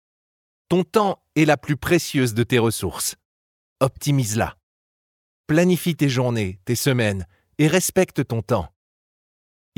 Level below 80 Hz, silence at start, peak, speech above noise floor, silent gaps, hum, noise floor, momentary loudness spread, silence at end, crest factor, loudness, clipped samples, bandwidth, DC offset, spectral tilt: -52 dBFS; 0.7 s; -4 dBFS; over 70 dB; 3.25-3.76 s, 4.63-5.44 s; none; under -90 dBFS; 7 LU; 1.1 s; 18 dB; -21 LUFS; under 0.1%; 18.5 kHz; under 0.1%; -5 dB/octave